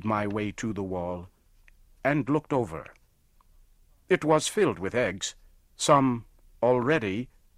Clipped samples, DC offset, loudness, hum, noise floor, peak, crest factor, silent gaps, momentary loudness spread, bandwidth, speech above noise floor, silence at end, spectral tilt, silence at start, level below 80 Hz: under 0.1%; under 0.1%; -27 LUFS; none; -62 dBFS; -8 dBFS; 20 dB; none; 13 LU; 15.5 kHz; 36 dB; 0.3 s; -5 dB/octave; 0 s; -56 dBFS